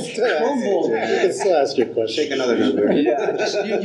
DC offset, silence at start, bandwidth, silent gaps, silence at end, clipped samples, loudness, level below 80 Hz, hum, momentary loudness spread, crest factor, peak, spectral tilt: under 0.1%; 0 s; 11.5 kHz; none; 0 s; under 0.1%; -19 LUFS; -78 dBFS; none; 4 LU; 14 dB; -6 dBFS; -4.5 dB/octave